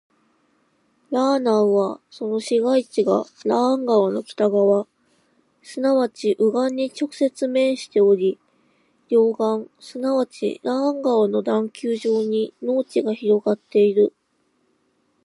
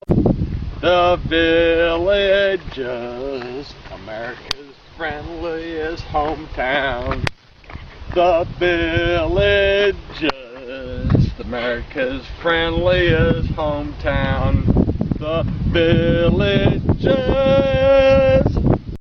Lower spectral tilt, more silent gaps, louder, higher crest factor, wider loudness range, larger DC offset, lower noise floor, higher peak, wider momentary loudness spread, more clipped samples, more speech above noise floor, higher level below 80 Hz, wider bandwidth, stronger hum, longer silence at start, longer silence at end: second, -6 dB/octave vs -7.5 dB/octave; neither; second, -21 LUFS vs -18 LUFS; about the same, 14 dB vs 18 dB; second, 2 LU vs 8 LU; neither; first, -67 dBFS vs -37 dBFS; second, -6 dBFS vs 0 dBFS; second, 8 LU vs 13 LU; neither; first, 47 dB vs 20 dB; second, -78 dBFS vs -28 dBFS; first, 11.5 kHz vs 6.8 kHz; neither; first, 1.1 s vs 0.1 s; first, 1.15 s vs 0 s